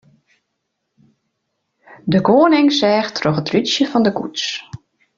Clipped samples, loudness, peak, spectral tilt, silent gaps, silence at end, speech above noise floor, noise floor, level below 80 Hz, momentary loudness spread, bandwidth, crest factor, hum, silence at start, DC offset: under 0.1%; -16 LUFS; -2 dBFS; -5 dB/octave; none; 0.4 s; 59 dB; -74 dBFS; -56 dBFS; 12 LU; 7.6 kHz; 16 dB; none; 2.05 s; under 0.1%